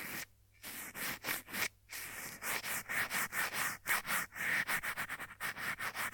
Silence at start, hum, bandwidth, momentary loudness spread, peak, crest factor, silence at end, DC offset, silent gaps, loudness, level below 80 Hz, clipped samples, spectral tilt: 0 s; none; 19 kHz; 11 LU; -20 dBFS; 20 dB; 0 s; under 0.1%; none; -37 LUFS; -68 dBFS; under 0.1%; -1 dB/octave